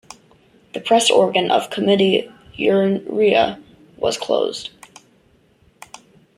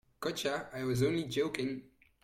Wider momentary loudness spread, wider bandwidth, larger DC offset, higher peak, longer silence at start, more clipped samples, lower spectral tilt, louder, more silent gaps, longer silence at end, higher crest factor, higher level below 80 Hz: first, 16 LU vs 7 LU; second, 14.5 kHz vs 16.5 kHz; neither; first, -2 dBFS vs -18 dBFS; first, 0.75 s vs 0.2 s; neither; second, -4 dB/octave vs -5.5 dB/octave; first, -18 LUFS vs -35 LUFS; neither; first, 1.7 s vs 0.35 s; about the same, 18 dB vs 18 dB; first, -58 dBFS vs -64 dBFS